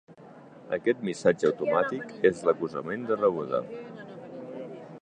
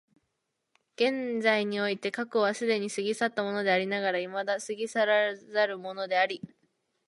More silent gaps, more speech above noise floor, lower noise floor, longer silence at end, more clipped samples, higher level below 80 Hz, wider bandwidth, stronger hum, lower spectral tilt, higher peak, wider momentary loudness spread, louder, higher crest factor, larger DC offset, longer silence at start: neither; second, 22 dB vs 53 dB; second, -49 dBFS vs -81 dBFS; second, 0.05 s vs 0.6 s; neither; first, -70 dBFS vs -82 dBFS; second, 9.8 kHz vs 11.5 kHz; neither; first, -6 dB/octave vs -4 dB/octave; about the same, -8 dBFS vs -10 dBFS; first, 17 LU vs 6 LU; about the same, -27 LUFS vs -28 LUFS; about the same, 20 dB vs 20 dB; neither; second, 0.1 s vs 1 s